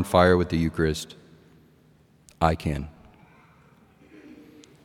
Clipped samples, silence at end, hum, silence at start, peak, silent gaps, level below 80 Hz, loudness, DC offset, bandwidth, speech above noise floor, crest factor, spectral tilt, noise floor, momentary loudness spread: under 0.1%; 0.55 s; none; 0 s; -4 dBFS; none; -46 dBFS; -24 LUFS; under 0.1%; 16.5 kHz; 36 dB; 24 dB; -6.5 dB/octave; -58 dBFS; 17 LU